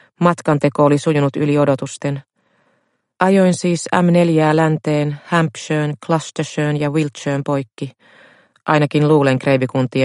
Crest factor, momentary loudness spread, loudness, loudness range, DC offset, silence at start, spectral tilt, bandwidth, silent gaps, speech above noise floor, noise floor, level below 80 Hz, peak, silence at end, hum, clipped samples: 16 dB; 9 LU; -16 LUFS; 4 LU; under 0.1%; 0.2 s; -6.5 dB/octave; 11.5 kHz; none; 49 dB; -65 dBFS; -58 dBFS; 0 dBFS; 0 s; none; under 0.1%